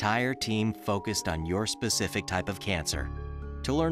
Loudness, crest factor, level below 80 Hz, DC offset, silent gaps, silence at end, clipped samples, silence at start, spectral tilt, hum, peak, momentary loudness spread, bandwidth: -30 LUFS; 18 dB; -42 dBFS; under 0.1%; none; 0 s; under 0.1%; 0 s; -4 dB/octave; none; -12 dBFS; 7 LU; 15.5 kHz